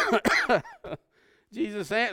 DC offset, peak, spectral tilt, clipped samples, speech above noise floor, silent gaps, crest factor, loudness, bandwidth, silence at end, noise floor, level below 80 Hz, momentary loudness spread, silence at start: under 0.1%; -6 dBFS; -4 dB/octave; under 0.1%; 36 dB; none; 22 dB; -26 LUFS; 17 kHz; 0 s; -63 dBFS; -58 dBFS; 19 LU; 0 s